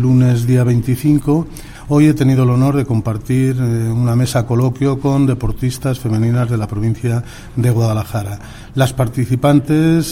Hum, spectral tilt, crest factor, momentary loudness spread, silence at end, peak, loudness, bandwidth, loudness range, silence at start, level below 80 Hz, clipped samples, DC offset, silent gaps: none; -7.5 dB/octave; 14 dB; 7 LU; 0 s; 0 dBFS; -15 LUFS; 16 kHz; 3 LU; 0 s; -34 dBFS; under 0.1%; under 0.1%; none